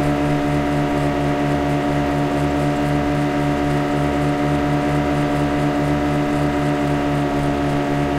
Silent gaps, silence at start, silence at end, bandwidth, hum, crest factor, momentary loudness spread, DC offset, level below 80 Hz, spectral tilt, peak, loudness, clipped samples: none; 0 s; 0 s; 14.5 kHz; none; 12 dB; 1 LU; under 0.1%; -34 dBFS; -7 dB/octave; -6 dBFS; -19 LUFS; under 0.1%